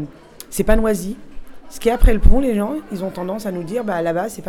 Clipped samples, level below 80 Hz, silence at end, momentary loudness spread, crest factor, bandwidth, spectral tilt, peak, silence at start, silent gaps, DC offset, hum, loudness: 0.2%; -20 dBFS; 0 s; 14 LU; 16 dB; 14 kHz; -6.5 dB/octave; 0 dBFS; 0 s; none; under 0.1%; none; -20 LUFS